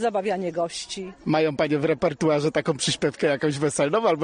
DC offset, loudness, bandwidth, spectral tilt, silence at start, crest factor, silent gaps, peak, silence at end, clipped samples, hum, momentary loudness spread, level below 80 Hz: under 0.1%; -24 LUFS; 10 kHz; -4.5 dB/octave; 0 s; 16 dB; none; -8 dBFS; 0 s; under 0.1%; none; 7 LU; -58 dBFS